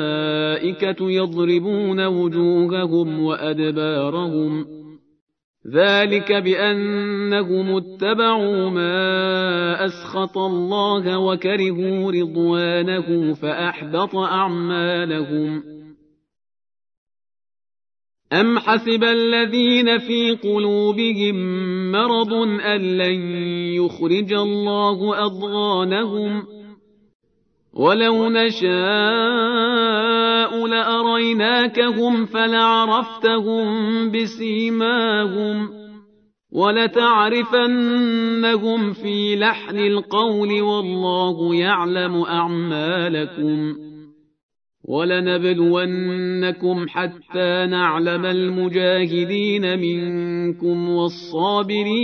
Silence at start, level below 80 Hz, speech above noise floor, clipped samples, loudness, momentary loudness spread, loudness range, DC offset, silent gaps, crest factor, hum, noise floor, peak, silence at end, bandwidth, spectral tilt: 0 s; -72 dBFS; 46 dB; under 0.1%; -19 LUFS; 6 LU; 5 LU; under 0.1%; 5.21-5.27 s, 5.44-5.54 s, 16.97-17.07 s, 27.15-27.20 s, 44.43-44.49 s; 16 dB; none; -65 dBFS; -2 dBFS; 0 s; 6.4 kHz; -7 dB/octave